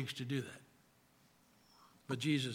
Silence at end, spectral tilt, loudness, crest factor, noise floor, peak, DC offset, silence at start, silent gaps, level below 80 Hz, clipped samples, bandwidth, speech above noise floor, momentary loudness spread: 0 s; -5 dB/octave; -40 LUFS; 20 dB; -70 dBFS; -22 dBFS; under 0.1%; 0 s; none; -84 dBFS; under 0.1%; 16.5 kHz; 31 dB; 22 LU